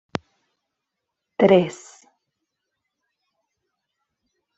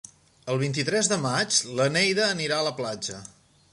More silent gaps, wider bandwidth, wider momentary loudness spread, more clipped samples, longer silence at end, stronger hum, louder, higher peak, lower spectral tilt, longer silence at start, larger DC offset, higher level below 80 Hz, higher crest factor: neither; second, 8 kHz vs 11.5 kHz; first, 21 LU vs 11 LU; neither; first, 2.85 s vs 0.45 s; neither; first, -18 LUFS vs -24 LUFS; first, -2 dBFS vs -8 dBFS; first, -6.5 dB/octave vs -3 dB/octave; first, 1.4 s vs 0.45 s; neither; about the same, -68 dBFS vs -66 dBFS; first, 24 dB vs 18 dB